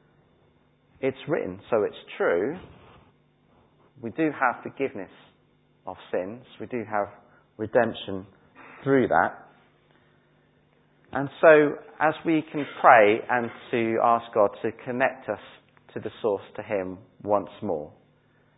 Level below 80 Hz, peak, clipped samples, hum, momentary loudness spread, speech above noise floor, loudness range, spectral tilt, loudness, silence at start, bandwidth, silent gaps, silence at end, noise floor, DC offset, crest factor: -64 dBFS; -2 dBFS; under 0.1%; none; 19 LU; 39 dB; 10 LU; -10 dB/octave; -25 LUFS; 1 s; 4 kHz; none; 0.7 s; -63 dBFS; under 0.1%; 24 dB